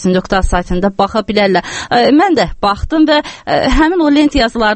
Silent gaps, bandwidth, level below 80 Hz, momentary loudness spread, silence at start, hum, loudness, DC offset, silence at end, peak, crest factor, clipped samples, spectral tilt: none; 8.8 kHz; -24 dBFS; 6 LU; 0 s; none; -12 LUFS; under 0.1%; 0 s; 0 dBFS; 12 dB; under 0.1%; -5.5 dB/octave